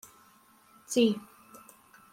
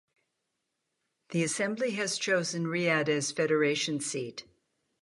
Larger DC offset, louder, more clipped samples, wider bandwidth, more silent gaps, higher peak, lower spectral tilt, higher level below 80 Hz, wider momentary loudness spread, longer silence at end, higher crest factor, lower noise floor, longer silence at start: neither; about the same, -29 LUFS vs -29 LUFS; neither; first, 16.5 kHz vs 11.5 kHz; neither; about the same, -14 dBFS vs -12 dBFS; about the same, -4 dB/octave vs -3.5 dB/octave; about the same, -78 dBFS vs -76 dBFS; first, 26 LU vs 8 LU; first, 0.95 s vs 0.6 s; about the same, 20 dB vs 20 dB; second, -61 dBFS vs -82 dBFS; second, 0.9 s vs 1.3 s